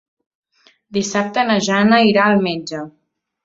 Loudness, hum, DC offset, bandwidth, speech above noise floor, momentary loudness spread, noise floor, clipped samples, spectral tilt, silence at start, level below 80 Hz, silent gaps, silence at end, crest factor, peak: -16 LUFS; none; under 0.1%; 7.8 kHz; 40 dB; 16 LU; -55 dBFS; under 0.1%; -4.5 dB/octave; 0.9 s; -60 dBFS; none; 0.55 s; 16 dB; -2 dBFS